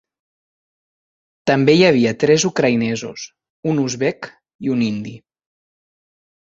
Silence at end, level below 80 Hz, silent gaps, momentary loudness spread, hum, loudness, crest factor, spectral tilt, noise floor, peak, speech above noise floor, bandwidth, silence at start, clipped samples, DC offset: 1.3 s; -58 dBFS; 3.50-3.63 s, 4.55-4.59 s; 21 LU; none; -17 LUFS; 18 dB; -5 dB/octave; under -90 dBFS; -2 dBFS; over 73 dB; 7.8 kHz; 1.45 s; under 0.1%; under 0.1%